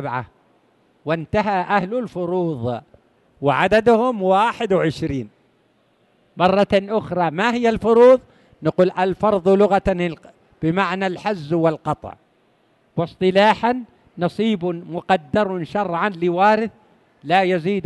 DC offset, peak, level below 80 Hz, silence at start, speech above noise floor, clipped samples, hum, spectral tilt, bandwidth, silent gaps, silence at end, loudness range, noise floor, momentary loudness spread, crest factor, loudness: under 0.1%; -2 dBFS; -48 dBFS; 0 s; 42 dB; under 0.1%; none; -7 dB/octave; 11.5 kHz; none; 0 s; 5 LU; -61 dBFS; 12 LU; 16 dB; -19 LUFS